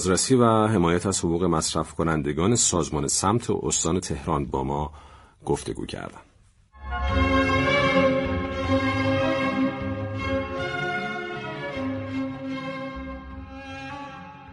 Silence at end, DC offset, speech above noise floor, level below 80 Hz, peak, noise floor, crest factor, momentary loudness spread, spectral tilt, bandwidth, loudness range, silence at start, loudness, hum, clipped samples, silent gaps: 0 s; under 0.1%; 32 dB; -40 dBFS; -6 dBFS; -55 dBFS; 20 dB; 16 LU; -4.5 dB/octave; 11.5 kHz; 8 LU; 0 s; -24 LUFS; none; under 0.1%; none